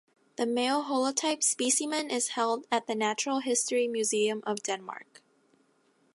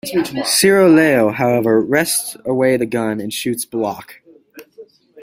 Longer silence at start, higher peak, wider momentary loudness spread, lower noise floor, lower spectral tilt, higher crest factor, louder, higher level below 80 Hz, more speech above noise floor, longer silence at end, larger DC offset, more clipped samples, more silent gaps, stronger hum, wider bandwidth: first, 0.4 s vs 0.05 s; second, -12 dBFS vs 0 dBFS; second, 8 LU vs 11 LU; first, -68 dBFS vs -43 dBFS; second, -1.5 dB/octave vs -4 dB/octave; about the same, 18 dB vs 16 dB; second, -29 LUFS vs -15 LUFS; second, -84 dBFS vs -56 dBFS; first, 39 dB vs 28 dB; first, 1.1 s vs 0 s; neither; neither; neither; neither; second, 12 kHz vs 16 kHz